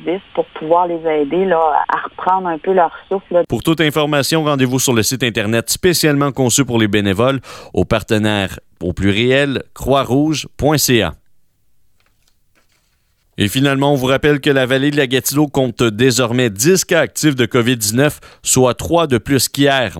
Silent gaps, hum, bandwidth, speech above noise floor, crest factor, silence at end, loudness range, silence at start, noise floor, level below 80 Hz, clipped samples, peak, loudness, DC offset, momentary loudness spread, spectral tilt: none; none; 17 kHz; 45 dB; 14 dB; 0 s; 4 LU; 0 s; -60 dBFS; -42 dBFS; under 0.1%; -2 dBFS; -15 LUFS; under 0.1%; 6 LU; -4.5 dB/octave